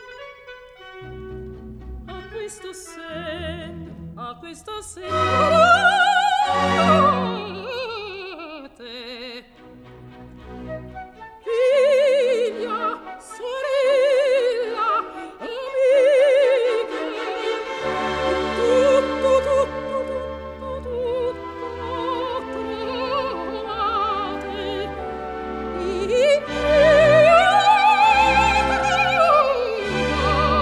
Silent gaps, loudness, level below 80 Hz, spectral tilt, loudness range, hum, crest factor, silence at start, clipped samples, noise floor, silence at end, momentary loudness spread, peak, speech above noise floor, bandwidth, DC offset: none; -19 LUFS; -42 dBFS; -4.5 dB/octave; 18 LU; none; 16 dB; 0 s; under 0.1%; -45 dBFS; 0 s; 21 LU; -4 dBFS; 25 dB; 12.5 kHz; under 0.1%